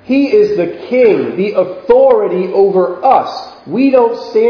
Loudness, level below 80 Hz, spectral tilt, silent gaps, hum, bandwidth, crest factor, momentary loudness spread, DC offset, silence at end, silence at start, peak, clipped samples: -11 LUFS; -50 dBFS; -7.5 dB/octave; none; none; 5.4 kHz; 10 dB; 7 LU; under 0.1%; 0 s; 0.1 s; 0 dBFS; 0.2%